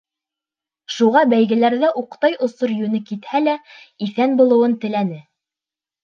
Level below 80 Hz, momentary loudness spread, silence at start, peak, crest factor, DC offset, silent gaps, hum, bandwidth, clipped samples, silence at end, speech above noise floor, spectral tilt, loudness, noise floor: -74 dBFS; 12 LU; 0.9 s; -2 dBFS; 16 dB; under 0.1%; none; none; 7.2 kHz; under 0.1%; 0.85 s; 72 dB; -6.5 dB/octave; -18 LUFS; -89 dBFS